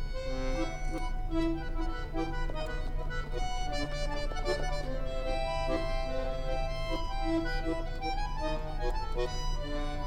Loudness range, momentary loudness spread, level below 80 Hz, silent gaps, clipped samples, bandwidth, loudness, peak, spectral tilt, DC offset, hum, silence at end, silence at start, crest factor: 2 LU; 5 LU; -34 dBFS; none; under 0.1%; 9.4 kHz; -36 LUFS; -18 dBFS; -5.5 dB/octave; under 0.1%; none; 0 s; 0 s; 14 dB